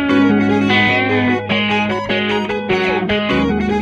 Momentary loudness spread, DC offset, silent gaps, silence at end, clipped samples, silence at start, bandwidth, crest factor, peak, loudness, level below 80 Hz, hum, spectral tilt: 5 LU; under 0.1%; none; 0 s; under 0.1%; 0 s; 8 kHz; 14 dB; 0 dBFS; -15 LUFS; -40 dBFS; none; -6 dB/octave